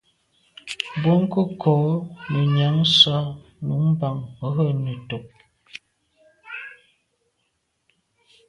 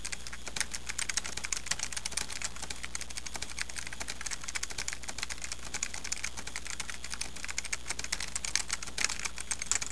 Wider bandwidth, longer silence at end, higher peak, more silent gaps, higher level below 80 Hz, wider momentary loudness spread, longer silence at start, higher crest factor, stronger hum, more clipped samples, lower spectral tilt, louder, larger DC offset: about the same, 11 kHz vs 11 kHz; first, 1.75 s vs 0 s; first, -2 dBFS vs -8 dBFS; neither; second, -58 dBFS vs -50 dBFS; first, 22 LU vs 7 LU; first, 0.65 s vs 0 s; second, 22 dB vs 30 dB; second, none vs 60 Hz at -50 dBFS; neither; first, -6.5 dB/octave vs 0 dB/octave; first, -21 LUFS vs -35 LUFS; second, under 0.1% vs 1%